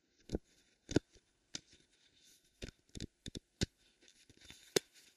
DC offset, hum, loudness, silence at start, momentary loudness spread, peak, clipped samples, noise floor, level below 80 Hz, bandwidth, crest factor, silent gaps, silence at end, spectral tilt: under 0.1%; none; -43 LUFS; 0.3 s; 24 LU; -12 dBFS; under 0.1%; -72 dBFS; -58 dBFS; 14.5 kHz; 32 dB; none; 0.35 s; -4 dB/octave